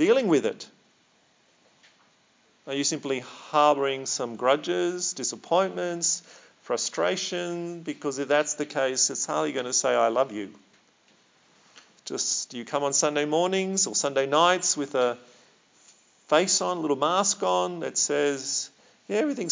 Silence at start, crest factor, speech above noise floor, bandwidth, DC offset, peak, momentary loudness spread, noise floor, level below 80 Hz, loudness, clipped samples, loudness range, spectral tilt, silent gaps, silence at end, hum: 0 s; 22 dB; 38 dB; 7.8 kHz; under 0.1%; -6 dBFS; 10 LU; -64 dBFS; -88 dBFS; -25 LUFS; under 0.1%; 4 LU; -2.5 dB/octave; none; 0 s; none